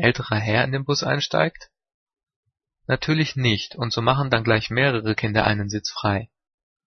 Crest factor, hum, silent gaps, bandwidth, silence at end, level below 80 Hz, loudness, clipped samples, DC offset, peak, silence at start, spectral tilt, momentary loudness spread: 22 dB; none; 1.94-2.07 s, 2.36-2.43 s; 6.6 kHz; 0.6 s; -50 dBFS; -22 LUFS; under 0.1%; under 0.1%; 0 dBFS; 0 s; -5.5 dB/octave; 5 LU